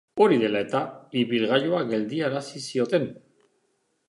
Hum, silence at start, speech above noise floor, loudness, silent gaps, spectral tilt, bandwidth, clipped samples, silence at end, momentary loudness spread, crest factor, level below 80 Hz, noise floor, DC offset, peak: none; 0.15 s; 48 dB; -25 LUFS; none; -5.5 dB/octave; 11.5 kHz; under 0.1%; 0.95 s; 10 LU; 20 dB; -72 dBFS; -72 dBFS; under 0.1%; -6 dBFS